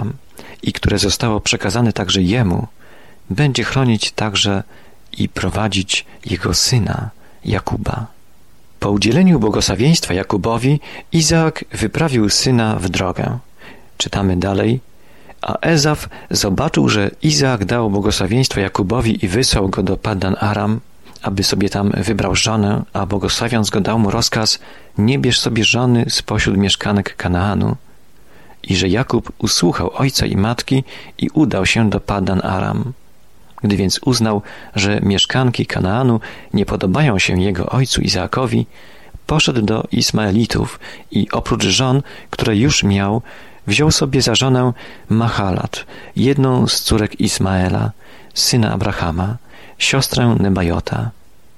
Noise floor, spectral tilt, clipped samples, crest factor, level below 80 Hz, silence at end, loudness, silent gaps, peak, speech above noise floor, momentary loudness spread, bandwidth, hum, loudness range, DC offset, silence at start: -51 dBFS; -4.5 dB/octave; under 0.1%; 14 dB; -36 dBFS; 0.45 s; -16 LUFS; none; -2 dBFS; 35 dB; 10 LU; 13.5 kHz; none; 3 LU; 0.9%; 0 s